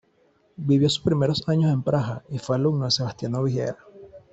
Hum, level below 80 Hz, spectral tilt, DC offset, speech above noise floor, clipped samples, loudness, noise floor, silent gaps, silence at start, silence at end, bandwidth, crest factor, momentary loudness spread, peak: none; -56 dBFS; -6.5 dB/octave; under 0.1%; 40 dB; under 0.1%; -24 LUFS; -63 dBFS; none; 0.6 s; 0.15 s; 8.2 kHz; 16 dB; 10 LU; -8 dBFS